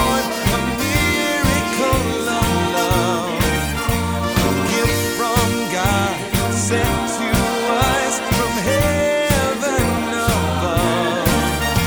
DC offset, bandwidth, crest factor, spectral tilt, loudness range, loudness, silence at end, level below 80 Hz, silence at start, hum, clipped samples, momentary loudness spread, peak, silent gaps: under 0.1%; over 20 kHz; 16 dB; -4.5 dB/octave; 1 LU; -18 LUFS; 0 s; -30 dBFS; 0 s; none; under 0.1%; 3 LU; -2 dBFS; none